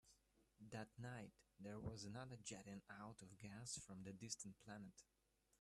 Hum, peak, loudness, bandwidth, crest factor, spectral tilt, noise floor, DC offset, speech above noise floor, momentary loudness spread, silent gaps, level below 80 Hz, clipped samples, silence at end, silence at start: none; -34 dBFS; -56 LUFS; 13 kHz; 22 dB; -4 dB/octave; -79 dBFS; under 0.1%; 23 dB; 7 LU; none; -78 dBFS; under 0.1%; 0.05 s; 0.05 s